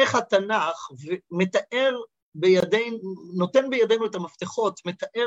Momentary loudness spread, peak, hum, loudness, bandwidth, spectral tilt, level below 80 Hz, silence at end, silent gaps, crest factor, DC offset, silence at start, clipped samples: 12 LU; -6 dBFS; none; -24 LUFS; 8.2 kHz; -5 dB/octave; -70 dBFS; 0 s; 2.22-2.32 s; 18 dB; under 0.1%; 0 s; under 0.1%